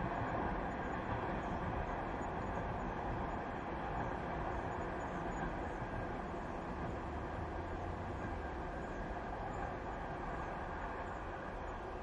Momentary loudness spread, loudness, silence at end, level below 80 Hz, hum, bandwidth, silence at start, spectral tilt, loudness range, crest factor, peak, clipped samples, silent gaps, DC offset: 4 LU; -42 LUFS; 0 s; -50 dBFS; none; 11 kHz; 0 s; -7 dB/octave; 3 LU; 14 dB; -26 dBFS; under 0.1%; none; under 0.1%